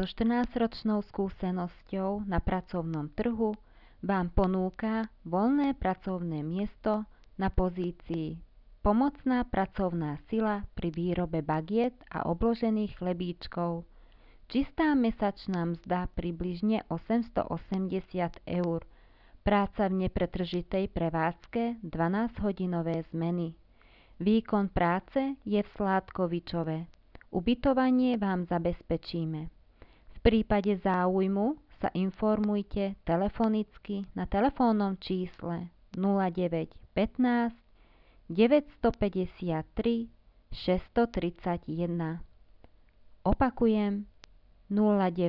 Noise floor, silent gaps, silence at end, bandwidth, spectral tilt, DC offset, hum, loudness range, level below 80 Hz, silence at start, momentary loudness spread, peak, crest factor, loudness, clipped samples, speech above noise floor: -59 dBFS; none; 0 s; 6 kHz; -9.5 dB/octave; under 0.1%; none; 3 LU; -46 dBFS; 0 s; 9 LU; -12 dBFS; 18 dB; -31 LUFS; under 0.1%; 30 dB